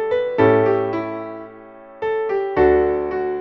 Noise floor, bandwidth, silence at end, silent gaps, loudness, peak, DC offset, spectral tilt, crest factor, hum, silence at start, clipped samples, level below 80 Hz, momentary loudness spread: -40 dBFS; 5.8 kHz; 0 s; none; -19 LUFS; -2 dBFS; under 0.1%; -9 dB/octave; 16 dB; none; 0 s; under 0.1%; -42 dBFS; 15 LU